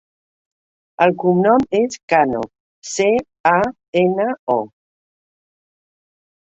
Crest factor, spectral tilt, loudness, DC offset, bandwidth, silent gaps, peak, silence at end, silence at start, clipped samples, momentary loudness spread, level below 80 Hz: 18 dB; -5.5 dB/octave; -17 LUFS; under 0.1%; 8.2 kHz; 2.03-2.08 s, 2.60-2.82 s, 3.40-3.44 s, 3.88-3.93 s, 4.39-4.47 s; 0 dBFS; 1.9 s; 1 s; under 0.1%; 11 LU; -56 dBFS